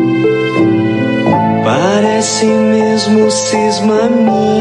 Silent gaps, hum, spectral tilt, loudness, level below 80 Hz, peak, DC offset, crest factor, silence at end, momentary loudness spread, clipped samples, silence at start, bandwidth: none; none; -5 dB/octave; -11 LUFS; -52 dBFS; 0 dBFS; under 0.1%; 10 dB; 0 s; 2 LU; under 0.1%; 0 s; 11 kHz